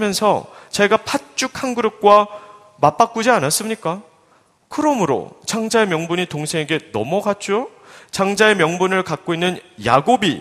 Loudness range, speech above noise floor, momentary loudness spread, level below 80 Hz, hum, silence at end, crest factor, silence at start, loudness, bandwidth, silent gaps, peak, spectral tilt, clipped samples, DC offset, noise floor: 3 LU; 38 dB; 10 LU; -58 dBFS; none; 0 s; 18 dB; 0 s; -18 LUFS; 15.5 kHz; none; 0 dBFS; -4 dB/octave; under 0.1%; under 0.1%; -56 dBFS